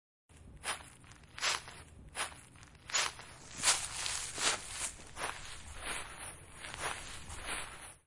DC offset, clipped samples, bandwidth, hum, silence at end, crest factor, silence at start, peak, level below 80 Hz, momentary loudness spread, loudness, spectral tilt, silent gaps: under 0.1%; under 0.1%; 11.5 kHz; none; 0.1 s; 26 dB; 0.3 s; -14 dBFS; -58 dBFS; 18 LU; -37 LUFS; 0 dB/octave; none